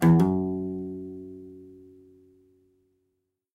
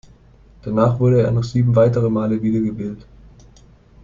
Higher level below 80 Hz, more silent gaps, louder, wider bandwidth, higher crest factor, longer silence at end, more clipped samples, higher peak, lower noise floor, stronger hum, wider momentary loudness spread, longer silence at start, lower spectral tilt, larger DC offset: second, -58 dBFS vs -46 dBFS; neither; second, -27 LUFS vs -18 LUFS; first, 13 kHz vs 7.4 kHz; about the same, 20 dB vs 16 dB; first, 1.8 s vs 1 s; neither; second, -8 dBFS vs -2 dBFS; first, -78 dBFS vs -48 dBFS; neither; first, 26 LU vs 14 LU; second, 0 s vs 0.65 s; about the same, -9 dB/octave vs -9.5 dB/octave; neither